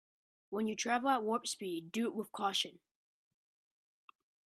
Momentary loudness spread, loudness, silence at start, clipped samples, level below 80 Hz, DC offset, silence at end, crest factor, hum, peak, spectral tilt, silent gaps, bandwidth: 8 LU; -36 LUFS; 0.5 s; under 0.1%; -86 dBFS; under 0.1%; 1.75 s; 20 dB; none; -18 dBFS; -3 dB/octave; none; 14.5 kHz